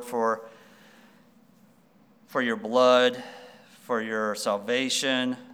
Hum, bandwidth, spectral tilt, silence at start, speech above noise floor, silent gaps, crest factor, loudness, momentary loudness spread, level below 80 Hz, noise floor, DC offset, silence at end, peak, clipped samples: none; 17 kHz; -2.5 dB/octave; 0 s; 34 dB; none; 20 dB; -25 LUFS; 14 LU; -84 dBFS; -59 dBFS; under 0.1%; 0 s; -8 dBFS; under 0.1%